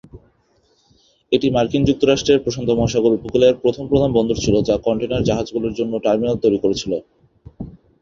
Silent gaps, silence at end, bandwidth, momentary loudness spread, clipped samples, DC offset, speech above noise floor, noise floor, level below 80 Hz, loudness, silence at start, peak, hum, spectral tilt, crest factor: none; 0.3 s; 7.6 kHz; 8 LU; under 0.1%; under 0.1%; 43 dB; -60 dBFS; -40 dBFS; -18 LUFS; 0.15 s; -2 dBFS; none; -6 dB/octave; 18 dB